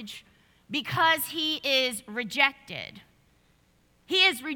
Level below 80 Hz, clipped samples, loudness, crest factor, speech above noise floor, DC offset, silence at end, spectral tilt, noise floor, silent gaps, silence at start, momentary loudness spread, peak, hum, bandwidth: -68 dBFS; under 0.1%; -25 LUFS; 24 dB; 37 dB; under 0.1%; 0 s; -2 dB/octave; -65 dBFS; none; 0 s; 17 LU; -4 dBFS; none; 19 kHz